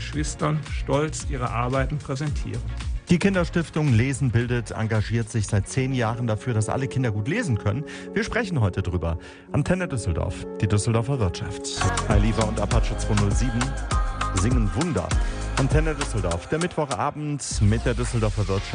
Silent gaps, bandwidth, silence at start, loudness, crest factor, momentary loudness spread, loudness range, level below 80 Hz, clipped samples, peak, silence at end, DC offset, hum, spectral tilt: none; 10.5 kHz; 0 s; -25 LUFS; 18 dB; 6 LU; 2 LU; -30 dBFS; under 0.1%; -6 dBFS; 0 s; under 0.1%; none; -6 dB/octave